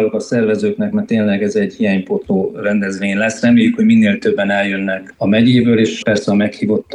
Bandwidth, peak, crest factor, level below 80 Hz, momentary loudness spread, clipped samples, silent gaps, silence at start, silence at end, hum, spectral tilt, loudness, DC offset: 10 kHz; -2 dBFS; 12 dB; -54 dBFS; 7 LU; under 0.1%; none; 0 s; 0 s; none; -6.5 dB/octave; -15 LUFS; under 0.1%